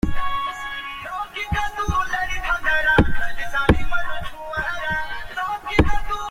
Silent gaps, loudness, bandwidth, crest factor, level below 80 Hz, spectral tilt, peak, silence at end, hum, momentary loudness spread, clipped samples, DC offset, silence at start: none; -23 LUFS; 15 kHz; 18 dB; -30 dBFS; -5.5 dB/octave; -2 dBFS; 0 s; none; 11 LU; under 0.1%; under 0.1%; 0.05 s